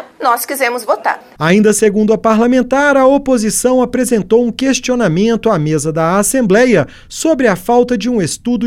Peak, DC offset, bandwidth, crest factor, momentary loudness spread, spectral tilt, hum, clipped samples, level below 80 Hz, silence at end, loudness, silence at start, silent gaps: 0 dBFS; under 0.1%; 16.5 kHz; 12 dB; 6 LU; -5 dB/octave; none; under 0.1%; -42 dBFS; 0 s; -12 LUFS; 0 s; none